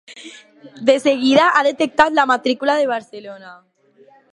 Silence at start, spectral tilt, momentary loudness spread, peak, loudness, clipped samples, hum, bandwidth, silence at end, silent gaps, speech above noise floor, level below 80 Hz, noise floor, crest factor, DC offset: 0.1 s; -3.5 dB/octave; 22 LU; 0 dBFS; -16 LUFS; under 0.1%; none; 11.5 kHz; 0.8 s; none; 34 dB; -60 dBFS; -51 dBFS; 18 dB; under 0.1%